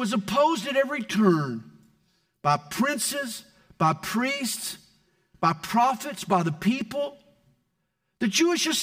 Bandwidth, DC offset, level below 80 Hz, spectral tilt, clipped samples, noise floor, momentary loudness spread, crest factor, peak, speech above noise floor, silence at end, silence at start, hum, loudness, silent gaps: 16 kHz; under 0.1%; -64 dBFS; -4 dB/octave; under 0.1%; -77 dBFS; 10 LU; 20 dB; -8 dBFS; 52 dB; 0 s; 0 s; none; -25 LUFS; none